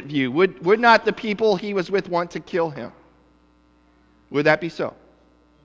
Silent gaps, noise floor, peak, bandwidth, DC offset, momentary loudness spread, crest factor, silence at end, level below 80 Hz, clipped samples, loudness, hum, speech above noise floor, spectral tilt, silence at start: none; -57 dBFS; -2 dBFS; 7.8 kHz; under 0.1%; 13 LU; 20 dB; 0.75 s; -60 dBFS; under 0.1%; -21 LUFS; none; 37 dB; -6 dB/octave; 0 s